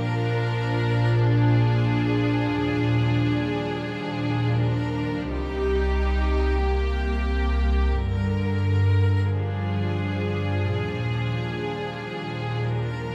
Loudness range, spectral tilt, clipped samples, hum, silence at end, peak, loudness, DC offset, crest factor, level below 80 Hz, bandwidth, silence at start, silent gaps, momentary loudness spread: 4 LU; -8 dB/octave; under 0.1%; none; 0 s; -10 dBFS; -24 LUFS; under 0.1%; 12 dB; -30 dBFS; 7.4 kHz; 0 s; none; 8 LU